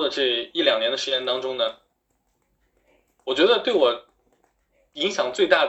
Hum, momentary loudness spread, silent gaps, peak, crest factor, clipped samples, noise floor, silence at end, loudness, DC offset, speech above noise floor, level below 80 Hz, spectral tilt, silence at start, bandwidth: none; 9 LU; none; -4 dBFS; 20 dB; under 0.1%; -71 dBFS; 0 s; -22 LUFS; under 0.1%; 49 dB; -66 dBFS; -2.5 dB/octave; 0 s; 8.2 kHz